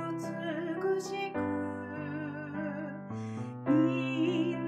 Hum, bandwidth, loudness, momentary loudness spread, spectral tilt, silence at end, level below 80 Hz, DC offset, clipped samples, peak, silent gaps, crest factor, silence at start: none; 12 kHz; -34 LUFS; 11 LU; -6.5 dB/octave; 0 s; -74 dBFS; under 0.1%; under 0.1%; -16 dBFS; none; 16 dB; 0 s